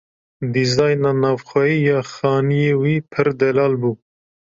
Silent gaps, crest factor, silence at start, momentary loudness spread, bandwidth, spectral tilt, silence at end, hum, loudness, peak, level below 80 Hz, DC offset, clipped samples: none; 16 dB; 0.4 s; 6 LU; 7.6 kHz; -6.5 dB/octave; 0.55 s; none; -18 LUFS; -2 dBFS; -56 dBFS; under 0.1%; under 0.1%